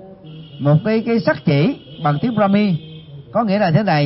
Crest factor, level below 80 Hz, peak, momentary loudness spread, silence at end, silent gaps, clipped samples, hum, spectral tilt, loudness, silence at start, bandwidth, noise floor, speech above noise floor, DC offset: 16 dB; -54 dBFS; -2 dBFS; 21 LU; 0 s; none; under 0.1%; none; -11 dB/octave; -17 LUFS; 0 s; 5.8 kHz; -37 dBFS; 21 dB; under 0.1%